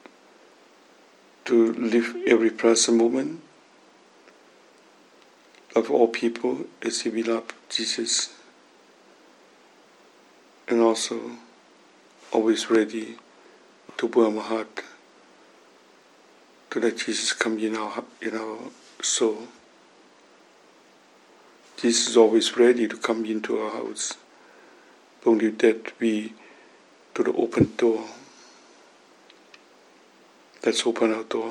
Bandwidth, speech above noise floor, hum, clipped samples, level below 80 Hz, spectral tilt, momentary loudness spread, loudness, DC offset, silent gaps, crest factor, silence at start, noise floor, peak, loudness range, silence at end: 11.5 kHz; 32 dB; none; under 0.1%; -68 dBFS; -3 dB/octave; 17 LU; -24 LUFS; under 0.1%; none; 22 dB; 1.45 s; -55 dBFS; -4 dBFS; 7 LU; 0 s